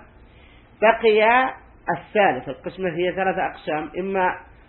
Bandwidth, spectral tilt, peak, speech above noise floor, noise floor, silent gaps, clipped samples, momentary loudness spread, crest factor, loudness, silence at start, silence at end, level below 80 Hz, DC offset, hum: 4.3 kHz; -10 dB/octave; -2 dBFS; 28 dB; -49 dBFS; none; under 0.1%; 12 LU; 20 dB; -21 LUFS; 0.8 s; 0.25 s; -52 dBFS; under 0.1%; none